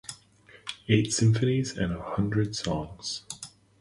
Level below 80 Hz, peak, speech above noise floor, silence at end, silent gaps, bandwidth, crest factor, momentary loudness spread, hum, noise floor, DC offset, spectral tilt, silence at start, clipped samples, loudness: -50 dBFS; -8 dBFS; 29 dB; 0.35 s; none; 11.5 kHz; 20 dB; 17 LU; none; -56 dBFS; under 0.1%; -5 dB/octave; 0.1 s; under 0.1%; -27 LUFS